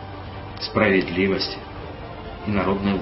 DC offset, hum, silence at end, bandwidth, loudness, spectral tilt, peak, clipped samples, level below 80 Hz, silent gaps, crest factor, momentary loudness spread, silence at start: under 0.1%; none; 0 s; 6 kHz; -22 LUFS; -8.5 dB/octave; -4 dBFS; under 0.1%; -42 dBFS; none; 20 dB; 17 LU; 0 s